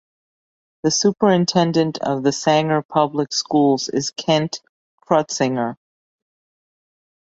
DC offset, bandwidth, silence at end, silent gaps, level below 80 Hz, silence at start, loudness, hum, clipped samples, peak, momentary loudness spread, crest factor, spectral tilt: under 0.1%; 8 kHz; 1.5 s; 2.85-2.89 s, 4.69-4.98 s; -62 dBFS; 0.85 s; -19 LUFS; none; under 0.1%; -2 dBFS; 7 LU; 18 dB; -4.5 dB/octave